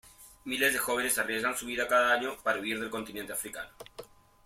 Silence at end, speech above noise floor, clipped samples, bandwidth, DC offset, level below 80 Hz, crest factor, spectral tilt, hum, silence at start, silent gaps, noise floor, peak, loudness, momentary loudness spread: 0.4 s; 20 dB; under 0.1%; 16.5 kHz; under 0.1%; -64 dBFS; 18 dB; -1.5 dB/octave; none; 0.05 s; none; -51 dBFS; -14 dBFS; -30 LUFS; 19 LU